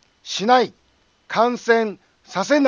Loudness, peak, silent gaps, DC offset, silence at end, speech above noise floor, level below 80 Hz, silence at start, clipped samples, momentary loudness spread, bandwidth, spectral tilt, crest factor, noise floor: -20 LUFS; -2 dBFS; none; under 0.1%; 0 s; 40 dB; -70 dBFS; 0.25 s; under 0.1%; 11 LU; 9.6 kHz; -4 dB/octave; 18 dB; -58 dBFS